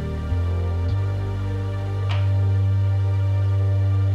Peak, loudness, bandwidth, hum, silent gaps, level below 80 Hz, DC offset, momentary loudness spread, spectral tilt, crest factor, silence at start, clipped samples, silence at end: -12 dBFS; -23 LUFS; 5 kHz; none; none; -36 dBFS; under 0.1%; 6 LU; -8.5 dB/octave; 8 dB; 0 s; under 0.1%; 0 s